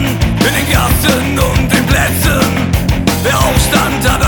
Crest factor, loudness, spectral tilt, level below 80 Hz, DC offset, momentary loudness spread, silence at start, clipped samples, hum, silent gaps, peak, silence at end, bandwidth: 12 dB; -11 LUFS; -4.5 dB/octave; -20 dBFS; under 0.1%; 3 LU; 0 s; under 0.1%; none; none; 0 dBFS; 0 s; 19.5 kHz